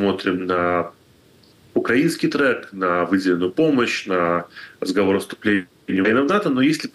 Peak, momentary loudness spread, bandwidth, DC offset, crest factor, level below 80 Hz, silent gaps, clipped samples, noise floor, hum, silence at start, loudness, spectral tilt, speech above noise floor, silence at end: -8 dBFS; 6 LU; 12.5 kHz; under 0.1%; 12 dB; -62 dBFS; none; under 0.1%; -52 dBFS; none; 0 s; -20 LUFS; -5.5 dB/octave; 33 dB; 0.05 s